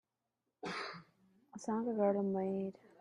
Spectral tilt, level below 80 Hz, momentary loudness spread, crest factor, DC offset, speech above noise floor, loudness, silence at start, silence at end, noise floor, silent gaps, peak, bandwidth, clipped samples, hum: -6.5 dB/octave; -82 dBFS; 15 LU; 20 dB; under 0.1%; 52 dB; -38 LUFS; 0.65 s; 0.3 s; -88 dBFS; none; -20 dBFS; 10.5 kHz; under 0.1%; none